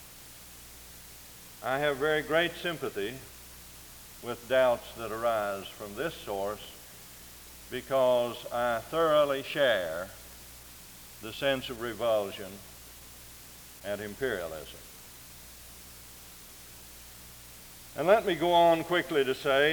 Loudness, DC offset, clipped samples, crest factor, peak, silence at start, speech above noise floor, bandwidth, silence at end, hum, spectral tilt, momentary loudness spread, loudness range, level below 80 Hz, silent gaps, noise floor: -29 LUFS; under 0.1%; under 0.1%; 24 dB; -8 dBFS; 0 s; 20 dB; over 20 kHz; 0 s; none; -4 dB/octave; 21 LU; 11 LU; -58 dBFS; none; -49 dBFS